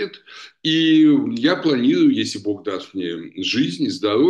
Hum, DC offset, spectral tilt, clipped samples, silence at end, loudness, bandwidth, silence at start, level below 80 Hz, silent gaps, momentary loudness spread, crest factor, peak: none; under 0.1%; -5 dB/octave; under 0.1%; 0 s; -19 LUFS; 9.6 kHz; 0 s; -66 dBFS; none; 13 LU; 14 dB; -4 dBFS